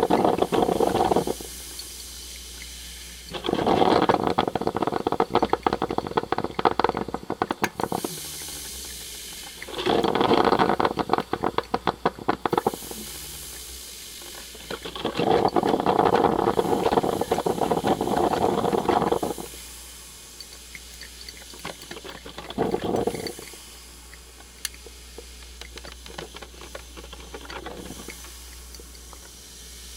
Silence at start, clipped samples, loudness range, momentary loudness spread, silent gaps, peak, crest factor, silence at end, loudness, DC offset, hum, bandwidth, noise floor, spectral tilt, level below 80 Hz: 0 s; under 0.1%; 16 LU; 19 LU; none; -4 dBFS; 22 dB; 0 s; -25 LUFS; under 0.1%; none; 17.5 kHz; -45 dBFS; -4.5 dB/octave; -48 dBFS